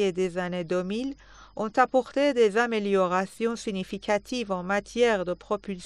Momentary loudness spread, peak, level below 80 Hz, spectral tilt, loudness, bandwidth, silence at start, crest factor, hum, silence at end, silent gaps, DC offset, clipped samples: 10 LU; -6 dBFS; -58 dBFS; -5 dB/octave; -27 LUFS; 11.5 kHz; 0 s; 20 dB; none; 0 s; none; under 0.1%; under 0.1%